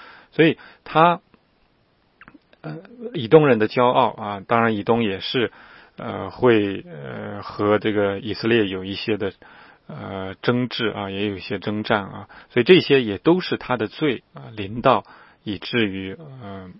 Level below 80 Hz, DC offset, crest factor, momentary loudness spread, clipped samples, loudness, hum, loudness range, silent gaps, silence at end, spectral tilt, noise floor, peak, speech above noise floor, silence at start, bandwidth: -58 dBFS; under 0.1%; 22 dB; 18 LU; under 0.1%; -21 LUFS; none; 5 LU; none; 0 s; -9.5 dB/octave; -62 dBFS; 0 dBFS; 41 dB; 0 s; 5.8 kHz